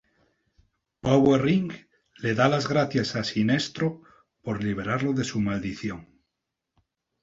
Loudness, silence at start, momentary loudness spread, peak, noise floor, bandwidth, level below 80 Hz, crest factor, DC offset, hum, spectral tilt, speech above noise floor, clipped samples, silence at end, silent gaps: -25 LUFS; 1.05 s; 14 LU; -4 dBFS; -83 dBFS; 7.8 kHz; -56 dBFS; 22 dB; under 0.1%; none; -6 dB/octave; 59 dB; under 0.1%; 1.2 s; none